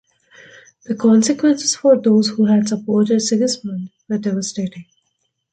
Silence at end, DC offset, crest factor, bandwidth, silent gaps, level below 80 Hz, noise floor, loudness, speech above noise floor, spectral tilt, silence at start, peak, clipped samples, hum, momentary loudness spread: 0.7 s; under 0.1%; 16 dB; 9.2 kHz; none; -62 dBFS; -70 dBFS; -17 LUFS; 54 dB; -5 dB/octave; 0.9 s; -2 dBFS; under 0.1%; none; 13 LU